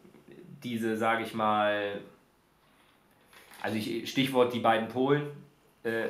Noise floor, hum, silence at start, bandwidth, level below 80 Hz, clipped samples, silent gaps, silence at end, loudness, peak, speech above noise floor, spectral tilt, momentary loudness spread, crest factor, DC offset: -65 dBFS; none; 0.3 s; 16 kHz; -78 dBFS; under 0.1%; none; 0 s; -29 LUFS; -12 dBFS; 37 dB; -5.5 dB/octave; 16 LU; 20 dB; under 0.1%